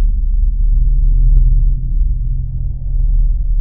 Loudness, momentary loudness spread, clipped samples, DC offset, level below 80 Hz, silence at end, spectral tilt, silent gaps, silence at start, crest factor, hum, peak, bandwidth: -18 LUFS; 7 LU; under 0.1%; 4%; -12 dBFS; 0 s; -14 dB/octave; none; 0 s; 12 dB; none; 0 dBFS; 0.6 kHz